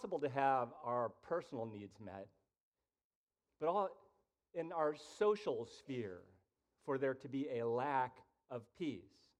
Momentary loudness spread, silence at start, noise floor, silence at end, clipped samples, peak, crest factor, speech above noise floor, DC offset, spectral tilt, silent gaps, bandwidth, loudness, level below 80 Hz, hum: 16 LU; 0 s; -78 dBFS; 0.4 s; under 0.1%; -22 dBFS; 20 dB; 37 dB; under 0.1%; -6.5 dB/octave; 2.60-2.72 s, 3.04-3.27 s; 10.5 kHz; -41 LUFS; -84 dBFS; none